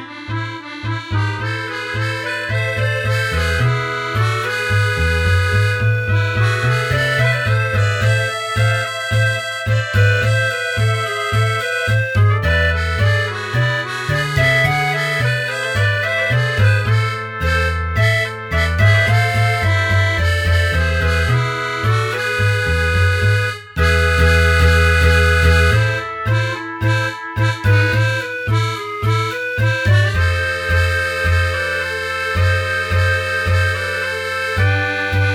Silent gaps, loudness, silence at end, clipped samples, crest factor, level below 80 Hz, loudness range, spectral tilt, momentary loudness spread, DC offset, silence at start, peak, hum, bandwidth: none; -16 LUFS; 0 s; under 0.1%; 14 dB; -28 dBFS; 3 LU; -5 dB/octave; 7 LU; under 0.1%; 0 s; -2 dBFS; none; 15.5 kHz